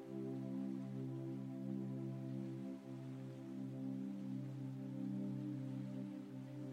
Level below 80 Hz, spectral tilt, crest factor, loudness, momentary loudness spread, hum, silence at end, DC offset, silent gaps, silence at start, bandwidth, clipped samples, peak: -88 dBFS; -9 dB/octave; 12 dB; -47 LUFS; 5 LU; none; 0 s; under 0.1%; none; 0 s; 10 kHz; under 0.1%; -34 dBFS